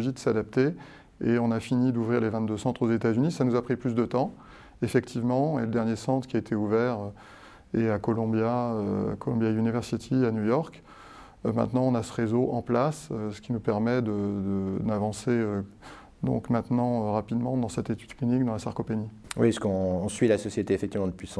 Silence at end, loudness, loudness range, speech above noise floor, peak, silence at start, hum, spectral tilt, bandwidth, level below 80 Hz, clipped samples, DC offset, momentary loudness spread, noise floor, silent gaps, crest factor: 0 s; -28 LUFS; 2 LU; 22 dB; -8 dBFS; 0 s; none; -7.5 dB/octave; 11 kHz; -56 dBFS; under 0.1%; under 0.1%; 7 LU; -49 dBFS; none; 18 dB